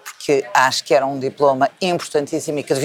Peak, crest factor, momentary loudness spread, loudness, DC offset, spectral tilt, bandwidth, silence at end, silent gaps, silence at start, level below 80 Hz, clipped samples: 0 dBFS; 18 dB; 7 LU; -18 LUFS; under 0.1%; -3.5 dB/octave; 18 kHz; 0 s; none; 0.05 s; -68 dBFS; under 0.1%